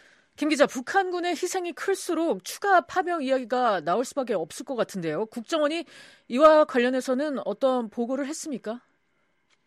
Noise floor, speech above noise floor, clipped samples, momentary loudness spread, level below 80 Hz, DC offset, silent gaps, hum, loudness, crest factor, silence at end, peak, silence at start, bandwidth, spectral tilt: -72 dBFS; 47 dB; under 0.1%; 11 LU; -68 dBFS; under 0.1%; none; none; -25 LUFS; 20 dB; 0.9 s; -4 dBFS; 0.4 s; 14 kHz; -4 dB/octave